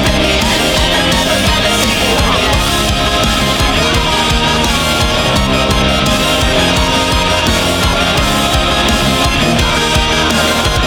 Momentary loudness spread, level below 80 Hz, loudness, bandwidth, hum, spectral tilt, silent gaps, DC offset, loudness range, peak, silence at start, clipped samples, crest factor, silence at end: 1 LU; -20 dBFS; -11 LUFS; over 20 kHz; none; -3.5 dB/octave; none; under 0.1%; 0 LU; 0 dBFS; 0 s; under 0.1%; 12 dB; 0 s